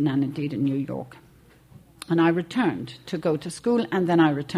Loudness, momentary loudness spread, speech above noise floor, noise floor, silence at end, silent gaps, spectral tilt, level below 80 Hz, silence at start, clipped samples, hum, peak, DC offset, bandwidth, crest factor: -24 LUFS; 13 LU; 29 dB; -53 dBFS; 0 s; none; -7 dB/octave; -62 dBFS; 0 s; under 0.1%; none; -8 dBFS; under 0.1%; 13 kHz; 16 dB